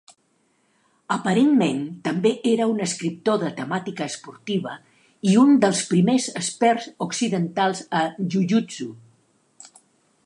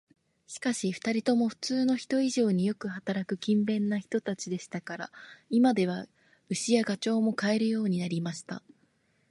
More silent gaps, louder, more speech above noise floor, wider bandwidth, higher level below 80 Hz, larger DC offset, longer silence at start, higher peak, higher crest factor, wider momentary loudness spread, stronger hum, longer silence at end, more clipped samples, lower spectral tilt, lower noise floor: neither; first, -22 LUFS vs -29 LUFS; first, 45 dB vs 41 dB; about the same, 11.5 kHz vs 11.5 kHz; about the same, -72 dBFS vs -74 dBFS; neither; first, 1.1 s vs 0.5 s; first, -4 dBFS vs -12 dBFS; about the same, 18 dB vs 18 dB; about the same, 12 LU vs 13 LU; neither; first, 1.3 s vs 0.7 s; neither; about the same, -5 dB/octave vs -5.5 dB/octave; second, -66 dBFS vs -70 dBFS